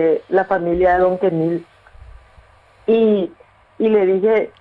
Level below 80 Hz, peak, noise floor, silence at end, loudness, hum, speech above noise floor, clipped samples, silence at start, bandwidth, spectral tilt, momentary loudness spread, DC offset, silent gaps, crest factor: -46 dBFS; -4 dBFS; -48 dBFS; 0.1 s; -17 LUFS; none; 33 dB; under 0.1%; 0 s; 4.7 kHz; -9 dB/octave; 7 LU; under 0.1%; none; 14 dB